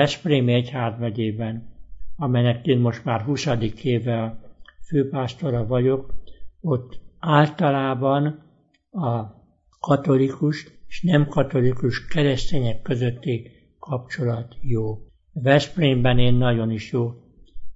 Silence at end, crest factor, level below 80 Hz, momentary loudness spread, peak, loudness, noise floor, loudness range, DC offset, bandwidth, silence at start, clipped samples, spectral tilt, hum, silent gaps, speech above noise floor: 0 s; 20 dB; -40 dBFS; 12 LU; -2 dBFS; -23 LUFS; -53 dBFS; 3 LU; under 0.1%; 7.8 kHz; 0 s; under 0.1%; -7 dB/octave; none; none; 33 dB